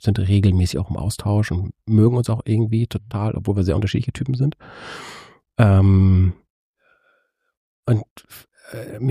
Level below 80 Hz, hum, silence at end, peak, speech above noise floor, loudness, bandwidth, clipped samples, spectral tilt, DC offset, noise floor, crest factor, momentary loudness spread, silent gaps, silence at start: -40 dBFS; none; 0 s; -2 dBFS; 47 dB; -19 LUFS; 13.5 kHz; under 0.1%; -7.5 dB/octave; under 0.1%; -65 dBFS; 18 dB; 20 LU; 6.50-6.74 s, 7.57-7.83 s, 8.11-8.16 s; 0.05 s